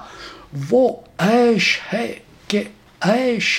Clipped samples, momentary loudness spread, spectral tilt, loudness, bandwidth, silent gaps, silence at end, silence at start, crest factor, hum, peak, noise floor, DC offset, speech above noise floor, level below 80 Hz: under 0.1%; 19 LU; -4.5 dB/octave; -18 LUFS; 16 kHz; none; 0 s; 0 s; 18 dB; none; -2 dBFS; -38 dBFS; under 0.1%; 20 dB; -56 dBFS